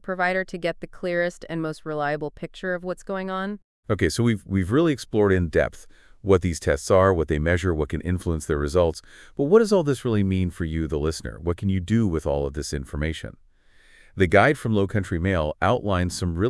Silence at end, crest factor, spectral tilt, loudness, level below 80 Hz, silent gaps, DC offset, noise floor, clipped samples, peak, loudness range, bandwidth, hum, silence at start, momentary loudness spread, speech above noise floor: 0 s; 20 dB; -6.5 dB/octave; -24 LUFS; -42 dBFS; 3.64-3.83 s; under 0.1%; -54 dBFS; under 0.1%; -4 dBFS; 5 LU; 12 kHz; none; 0.05 s; 11 LU; 31 dB